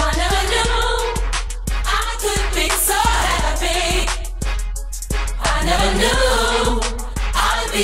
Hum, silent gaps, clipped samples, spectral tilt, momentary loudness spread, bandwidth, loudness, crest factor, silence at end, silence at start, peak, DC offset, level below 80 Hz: none; none; under 0.1%; -3 dB/octave; 9 LU; 16 kHz; -19 LUFS; 14 dB; 0 s; 0 s; -4 dBFS; under 0.1%; -22 dBFS